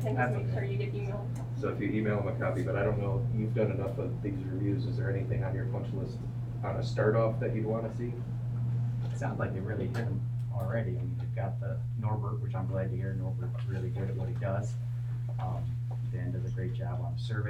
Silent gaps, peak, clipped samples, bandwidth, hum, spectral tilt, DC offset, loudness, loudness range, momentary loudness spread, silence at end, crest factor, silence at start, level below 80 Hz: none; -16 dBFS; under 0.1%; 7.6 kHz; none; -9 dB/octave; under 0.1%; -33 LUFS; 3 LU; 5 LU; 0 s; 16 dB; 0 s; -52 dBFS